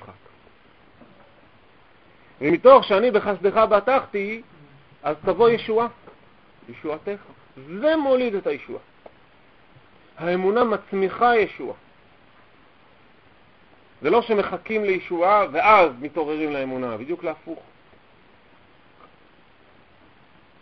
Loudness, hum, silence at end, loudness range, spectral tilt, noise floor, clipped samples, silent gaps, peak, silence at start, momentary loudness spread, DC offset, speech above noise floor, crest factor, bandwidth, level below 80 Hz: -21 LUFS; none; 3.05 s; 8 LU; -7.5 dB/octave; -55 dBFS; under 0.1%; none; 0 dBFS; 0.1 s; 19 LU; 0.1%; 34 dB; 22 dB; 6 kHz; -58 dBFS